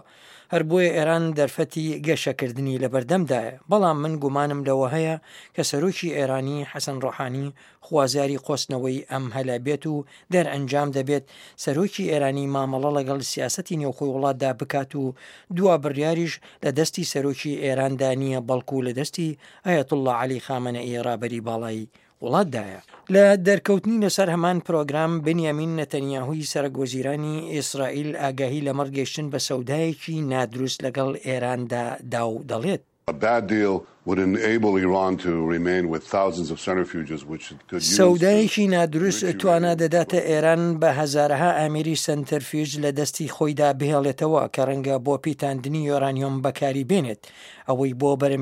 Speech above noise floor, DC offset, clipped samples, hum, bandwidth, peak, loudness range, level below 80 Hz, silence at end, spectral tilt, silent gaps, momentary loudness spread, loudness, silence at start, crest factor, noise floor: 27 dB; under 0.1%; under 0.1%; none; 16 kHz; -2 dBFS; 6 LU; -64 dBFS; 0 s; -5.5 dB/octave; none; 9 LU; -23 LUFS; 0.3 s; 20 dB; -50 dBFS